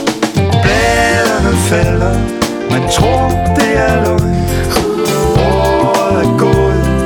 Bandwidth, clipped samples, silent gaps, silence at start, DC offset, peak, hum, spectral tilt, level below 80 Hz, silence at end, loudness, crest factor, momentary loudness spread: 20 kHz; under 0.1%; none; 0 s; under 0.1%; 0 dBFS; none; -5.5 dB/octave; -22 dBFS; 0 s; -12 LUFS; 12 dB; 4 LU